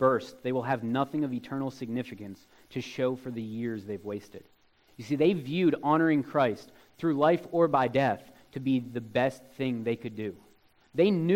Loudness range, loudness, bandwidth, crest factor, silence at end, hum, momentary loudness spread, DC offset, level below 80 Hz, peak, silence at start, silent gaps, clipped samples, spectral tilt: 9 LU; -29 LUFS; 16.5 kHz; 18 dB; 0 s; none; 14 LU; under 0.1%; -68 dBFS; -10 dBFS; 0 s; none; under 0.1%; -7.5 dB/octave